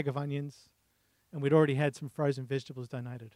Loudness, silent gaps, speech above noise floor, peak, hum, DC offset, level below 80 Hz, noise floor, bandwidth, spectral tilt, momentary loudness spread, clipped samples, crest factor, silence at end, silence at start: -32 LUFS; none; 41 dB; -12 dBFS; none; under 0.1%; -74 dBFS; -73 dBFS; 12 kHz; -7.5 dB/octave; 15 LU; under 0.1%; 20 dB; 0.05 s; 0 s